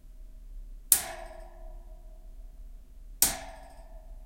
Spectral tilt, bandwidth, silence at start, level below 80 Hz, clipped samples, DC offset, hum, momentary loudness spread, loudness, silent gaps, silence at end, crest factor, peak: 0 dB/octave; 16.5 kHz; 0.05 s; -46 dBFS; under 0.1%; under 0.1%; none; 27 LU; -26 LUFS; none; 0 s; 34 dB; 0 dBFS